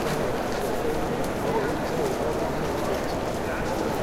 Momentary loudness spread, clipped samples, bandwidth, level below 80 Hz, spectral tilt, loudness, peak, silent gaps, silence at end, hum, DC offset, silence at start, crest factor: 2 LU; under 0.1%; 17 kHz; -40 dBFS; -5.5 dB/octave; -27 LUFS; -12 dBFS; none; 0 s; none; under 0.1%; 0 s; 14 dB